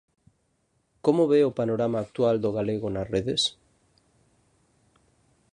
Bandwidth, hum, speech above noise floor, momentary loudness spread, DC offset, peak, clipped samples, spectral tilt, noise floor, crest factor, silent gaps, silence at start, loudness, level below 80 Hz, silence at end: 10.5 kHz; none; 47 dB; 7 LU; under 0.1%; -8 dBFS; under 0.1%; -5.5 dB/octave; -71 dBFS; 18 dB; none; 1.05 s; -25 LUFS; -58 dBFS; 2.05 s